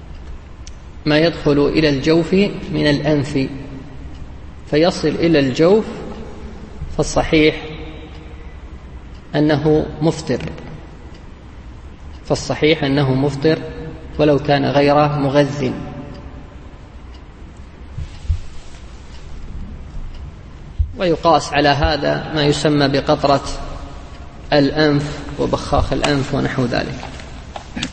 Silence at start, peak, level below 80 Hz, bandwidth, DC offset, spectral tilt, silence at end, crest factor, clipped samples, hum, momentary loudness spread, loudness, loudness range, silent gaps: 0 s; 0 dBFS; -32 dBFS; 8.8 kHz; under 0.1%; -6 dB/octave; 0 s; 18 dB; under 0.1%; none; 23 LU; -17 LUFS; 12 LU; none